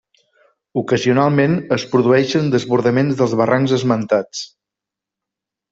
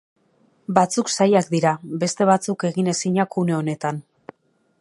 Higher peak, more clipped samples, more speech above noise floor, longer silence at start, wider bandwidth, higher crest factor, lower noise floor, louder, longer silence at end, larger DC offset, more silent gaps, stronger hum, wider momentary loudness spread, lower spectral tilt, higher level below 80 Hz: about the same, -2 dBFS vs 0 dBFS; neither; first, 69 dB vs 43 dB; about the same, 0.75 s vs 0.7 s; second, 7.8 kHz vs 11.5 kHz; second, 14 dB vs 20 dB; first, -85 dBFS vs -63 dBFS; first, -16 LUFS vs -21 LUFS; first, 1.25 s vs 0.8 s; neither; neither; neither; about the same, 10 LU vs 8 LU; first, -6.5 dB/octave vs -5 dB/octave; first, -56 dBFS vs -68 dBFS